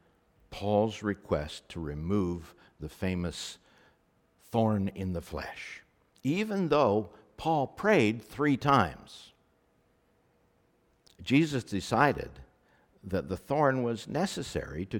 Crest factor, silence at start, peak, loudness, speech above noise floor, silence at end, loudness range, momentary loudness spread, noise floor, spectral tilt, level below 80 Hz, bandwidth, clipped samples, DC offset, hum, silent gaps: 22 dB; 0.5 s; -10 dBFS; -30 LUFS; 39 dB; 0 s; 7 LU; 18 LU; -69 dBFS; -6 dB/octave; -54 dBFS; 18 kHz; under 0.1%; under 0.1%; none; none